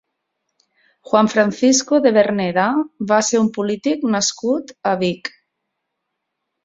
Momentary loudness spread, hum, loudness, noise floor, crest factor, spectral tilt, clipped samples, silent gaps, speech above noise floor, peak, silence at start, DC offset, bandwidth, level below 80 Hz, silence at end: 8 LU; none; -17 LUFS; -77 dBFS; 16 dB; -4 dB/octave; under 0.1%; none; 60 dB; -2 dBFS; 1.1 s; under 0.1%; 7.8 kHz; -62 dBFS; 1.35 s